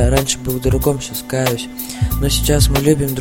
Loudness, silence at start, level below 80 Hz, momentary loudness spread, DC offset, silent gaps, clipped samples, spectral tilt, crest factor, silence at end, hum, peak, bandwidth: -17 LUFS; 0 s; -22 dBFS; 8 LU; under 0.1%; none; under 0.1%; -5 dB/octave; 16 dB; 0 s; none; 0 dBFS; 17 kHz